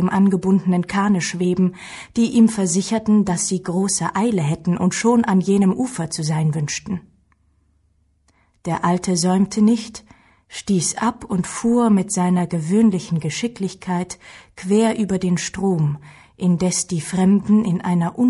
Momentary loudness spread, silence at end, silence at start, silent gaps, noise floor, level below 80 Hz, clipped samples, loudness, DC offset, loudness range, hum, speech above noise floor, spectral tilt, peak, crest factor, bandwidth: 9 LU; 0 s; 0 s; none; -62 dBFS; -52 dBFS; under 0.1%; -19 LUFS; under 0.1%; 4 LU; none; 43 dB; -5.5 dB/octave; -4 dBFS; 16 dB; 11.5 kHz